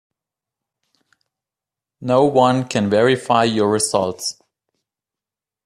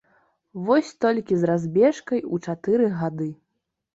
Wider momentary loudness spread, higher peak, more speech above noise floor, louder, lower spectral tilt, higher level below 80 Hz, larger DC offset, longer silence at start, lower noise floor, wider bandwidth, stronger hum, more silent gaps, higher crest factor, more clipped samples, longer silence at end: about the same, 10 LU vs 12 LU; first, 0 dBFS vs -6 dBFS; first, 72 dB vs 57 dB; first, -17 LUFS vs -23 LUFS; second, -4.5 dB/octave vs -7.5 dB/octave; about the same, -60 dBFS vs -64 dBFS; neither; first, 2 s vs 0.55 s; first, -89 dBFS vs -79 dBFS; first, 14.5 kHz vs 8 kHz; neither; neither; about the same, 20 dB vs 16 dB; neither; first, 1.35 s vs 0.6 s